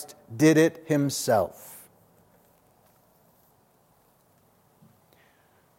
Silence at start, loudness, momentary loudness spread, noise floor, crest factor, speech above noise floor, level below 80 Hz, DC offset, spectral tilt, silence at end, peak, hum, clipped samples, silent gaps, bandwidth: 0 s; -23 LUFS; 25 LU; -63 dBFS; 22 dB; 40 dB; -72 dBFS; under 0.1%; -5.5 dB/octave; 4 s; -8 dBFS; none; under 0.1%; none; 16.5 kHz